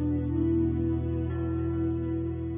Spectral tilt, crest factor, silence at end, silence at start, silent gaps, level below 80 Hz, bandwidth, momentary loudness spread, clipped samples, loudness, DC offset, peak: -11 dB/octave; 10 dB; 0 s; 0 s; none; -36 dBFS; 3.6 kHz; 4 LU; under 0.1%; -29 LUFS; under 0.1%; -18 dBFS